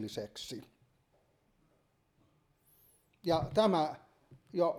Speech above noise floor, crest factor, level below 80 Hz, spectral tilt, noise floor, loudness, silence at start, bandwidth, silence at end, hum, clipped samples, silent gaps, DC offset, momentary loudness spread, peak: 41 dB; 22 dB; -64 dBFS; -6 dB/octave; -74 dBFS; -34 LUFS; 0 s; 16 kHz; 0 s; none; under 0.1%; none; under 0.1%; 17 LU; -16 dBFS